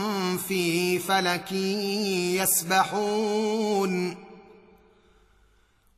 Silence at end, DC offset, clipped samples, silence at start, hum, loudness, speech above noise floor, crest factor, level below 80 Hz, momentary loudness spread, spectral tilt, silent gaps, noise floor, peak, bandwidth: 1.55 s; under 0.1%; under 0.1%; 0 s; none; -25 LUFS; 37 dB; 18 dB; -66 dBFS; 6 LU; -3.5 dB/octave; none; -63 dBFS; -10 dBFS; 15.5 kHz